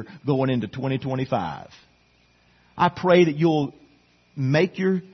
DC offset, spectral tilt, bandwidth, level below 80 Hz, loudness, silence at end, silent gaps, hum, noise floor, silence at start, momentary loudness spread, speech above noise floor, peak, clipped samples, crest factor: under 0.1%; -7.5 dB/octave; 6.4 kHz; -60 dBFS; -23 LUFS; 0.05 s; none; none; -60 dBFS; 0 s; 13 LU; 38 dB; -4 dBFS; under 0.1%; 20 dB